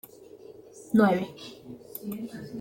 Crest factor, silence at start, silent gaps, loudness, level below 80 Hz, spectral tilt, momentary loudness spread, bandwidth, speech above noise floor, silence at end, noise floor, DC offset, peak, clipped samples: 20 dB; 0.2 s; none; -28 LUFS; -68 dBFS; -7 dB/octave; 26 LU; 17 kHz; 23 dB; 0 s; -49 dBFS; under 0.1%; -10 dBFS; under 0.1%